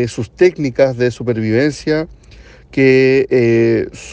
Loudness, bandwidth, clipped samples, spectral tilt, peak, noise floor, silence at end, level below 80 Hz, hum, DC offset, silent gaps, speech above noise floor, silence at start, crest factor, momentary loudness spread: -14 LUFS; 9 kHz; under 0.1%; -7 dB/octave; 0 dBFS; -40 dBFS; 0 s; -44 dBFS; none; under 0.1%; none; 27 dB; 0 s; 14 dB; 8 LU